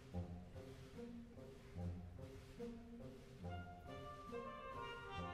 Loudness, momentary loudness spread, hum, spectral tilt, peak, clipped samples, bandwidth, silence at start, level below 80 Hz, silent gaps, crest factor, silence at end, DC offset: -53 LUFS; 6 LU; none; -6.5 dB/octave; -36 dBFS; under 0.1%; 14.5 kHz; 0 s; -64 dBFS; none; 16 dB; 0 s; under 0.1%